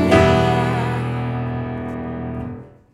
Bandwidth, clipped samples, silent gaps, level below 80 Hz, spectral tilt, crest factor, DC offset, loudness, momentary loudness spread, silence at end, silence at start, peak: 12 kHz; under 0.1%; none; -36 dBFS; -7 dB/octave; 18 dB; under 0.1%; -20 LUFS; 15 LU; 0.25 s; 0 s; 0 dBFS